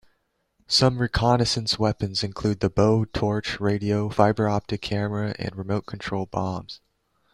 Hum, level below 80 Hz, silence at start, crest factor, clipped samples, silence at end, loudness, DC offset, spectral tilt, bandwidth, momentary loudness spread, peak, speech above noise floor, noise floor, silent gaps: none; -46 dBFS; 0.7 s; 20 dB; under 0.1%; 0.6 s; -24 LUFS; under 0.1%; -5.5 dB/octave; 12 kHz; 9 LU; -4 dBFS; 47 dB; -71 dBFS; none